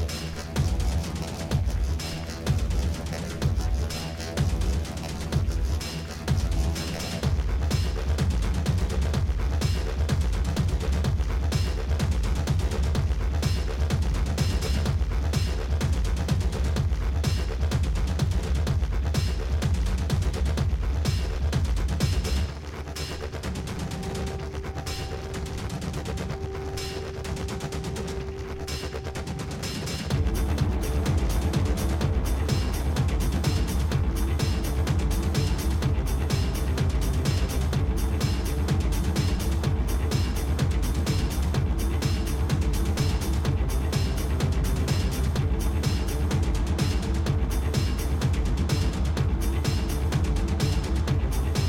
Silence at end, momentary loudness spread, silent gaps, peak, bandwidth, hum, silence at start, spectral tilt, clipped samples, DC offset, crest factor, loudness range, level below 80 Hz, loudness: 0 s; 6 LU; none; -12 dBFS; 16.5 kHz; none; 0 s; -5.5 dB/octave; under 0.1%; under 0.1%; 14 dB; 6 LU; -28 dBFS; -27 LUFS